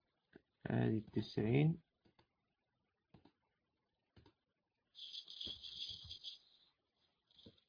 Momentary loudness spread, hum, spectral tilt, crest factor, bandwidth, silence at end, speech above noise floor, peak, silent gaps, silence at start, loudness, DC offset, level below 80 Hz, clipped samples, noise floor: 17 LU; none; -6 dB/octave; 24 dB; 5.2 kHz; 0.2 s; 52 dB; -22 dBFS; none; 0.65 s; -41 LUFS; under 0.1%; -72 dBFS; under 0.1%; -89 dBFS